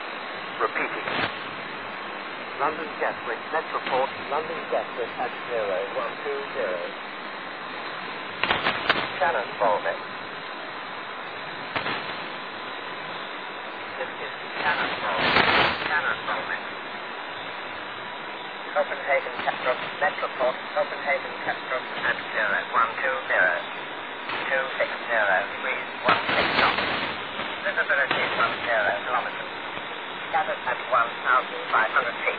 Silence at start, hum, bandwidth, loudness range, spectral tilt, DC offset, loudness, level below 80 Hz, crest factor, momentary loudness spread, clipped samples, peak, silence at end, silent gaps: 0 s; none; 5 kHz; 6 LU; -6 dB/octave; 0.2%; -26 LUFS; -62 dBFS; 24 dB; 12 LU; under 0.1%; -4 dBFS; 0 s; none